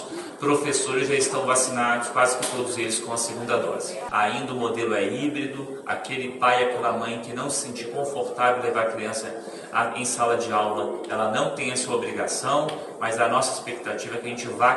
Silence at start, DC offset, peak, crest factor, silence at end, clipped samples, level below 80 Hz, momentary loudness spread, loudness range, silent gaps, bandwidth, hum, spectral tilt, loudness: 0 s; under 0.1%; -6 dBFS; 18 dB; 0 s; under 0.1%; -68 dBFS; 9 LU; 3 LU; none; 11.5 kHz; none; -3 dB/octave; -25 LUFS